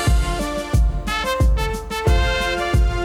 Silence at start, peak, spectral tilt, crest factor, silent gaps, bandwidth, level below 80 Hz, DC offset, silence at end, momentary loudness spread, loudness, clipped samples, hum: 0 s; -6 dBFS; -5 dB/octave; 12 dB; none; 15 kHz; -20 dBFS; under 0.1%; 0 s; 4 LU; -20 LUFS; under 0.1%; none